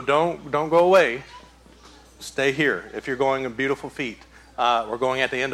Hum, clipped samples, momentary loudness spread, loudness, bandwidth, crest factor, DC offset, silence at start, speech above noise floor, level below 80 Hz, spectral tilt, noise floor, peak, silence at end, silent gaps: none; under 0.1%; 14 LU; -22 LUFS; 15.5 kHz; 18 dB; under 0.1%; 0 s; 27 dB; -54 dBFS; -4.5 dB/octave; -49 dBFS; -6 dBFS; 0 s; none